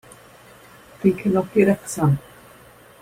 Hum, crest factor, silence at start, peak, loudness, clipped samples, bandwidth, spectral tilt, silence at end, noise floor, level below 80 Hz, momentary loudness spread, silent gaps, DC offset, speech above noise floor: none; 18 dB; 1 s; -4 dBFS; -20 LUFS; under 0.1%; 16 kHz; -7.5 dB/octave; 0.8 s; -48 dBFS; -54 dBFS; 4 LU; none; under 0.1%; 29 dB